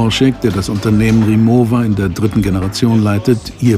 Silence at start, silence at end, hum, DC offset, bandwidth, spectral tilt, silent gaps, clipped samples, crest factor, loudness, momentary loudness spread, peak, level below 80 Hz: 0 s; 0 s; none; under 0.1%; 15 kHz; -6.5 dB/octave; none; under 0.1%; 12 dB; -13 LUFS; 5 LU; 0 dBFS; -32 dBFS